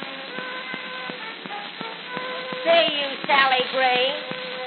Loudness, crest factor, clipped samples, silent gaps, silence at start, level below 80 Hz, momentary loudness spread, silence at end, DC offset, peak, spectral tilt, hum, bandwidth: -23 LUFS; 22 dB; under 0.1%; none; 0 s; under -90 dBFS; 14 LU; 0 s; under 0.1%; -2 dBFS; 1 dB/octave; none; 4.9 kHz